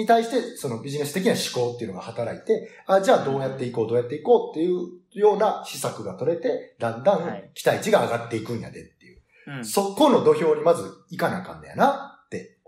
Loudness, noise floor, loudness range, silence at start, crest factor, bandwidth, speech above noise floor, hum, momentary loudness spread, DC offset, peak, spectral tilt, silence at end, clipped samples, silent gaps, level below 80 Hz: -23 LUFS; -54 dBFS; 3 LU; 0 s; 18 dB; 16 kHz; 31 dB; none; 14 LU; under 0.1%; -6 dBFS; -5 dB/octave; 0.2 s; under 0.1%; none; -66 dBFS